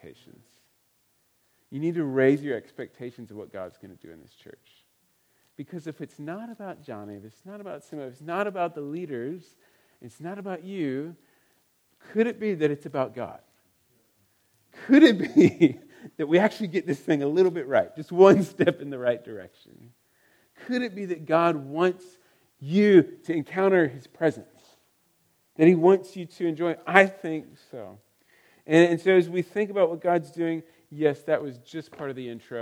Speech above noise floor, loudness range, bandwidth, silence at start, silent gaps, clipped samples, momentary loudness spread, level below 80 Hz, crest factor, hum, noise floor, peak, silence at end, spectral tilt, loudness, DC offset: 44 dB; 16 LU; 12 kHz; 0.05 s; none; under 0.1%; 23 LU; -76 dBFS; 26 dB; none; -69 dBFS; 0 dBFS; 0 s; -7 dB/octave; -24 LUFS; under 0.1%